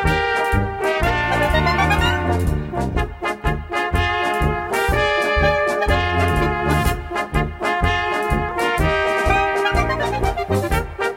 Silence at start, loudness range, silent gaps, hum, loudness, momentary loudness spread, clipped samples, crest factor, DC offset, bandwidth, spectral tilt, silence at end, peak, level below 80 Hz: 0 s; 1 LU; none; none; -19 LUFS; 6 LU; under 0.1%; 16 dB; under 0.1%; 16.5 kHz; -5.5 dB/octave; 0 s; -4 dBFS; -26 dBFS